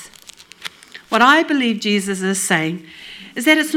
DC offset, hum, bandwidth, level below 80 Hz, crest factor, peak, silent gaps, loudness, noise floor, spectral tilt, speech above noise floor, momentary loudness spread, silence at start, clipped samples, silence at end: under 0.1%; none; 18.5 kHz; -64 dBFS; 18 dB; 0 dBFS; none; -16 LUFS; -43 dBFS; -3.5 dB/octave; 26 dB; 21 LU; 0 s; under 0.1%; 0 s